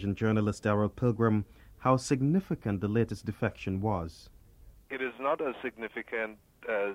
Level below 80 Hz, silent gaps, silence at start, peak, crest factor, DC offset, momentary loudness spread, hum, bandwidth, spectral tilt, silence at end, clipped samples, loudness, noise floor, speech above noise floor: -56 dBFS; none; 0 s; -10 dBFS; 20 dB; under 0.1%; 10 LU; none; 13 kHz; -7 dB/octave; 0 s; under 0.1%; -31 LUFS; -56 dBFS; 25 dB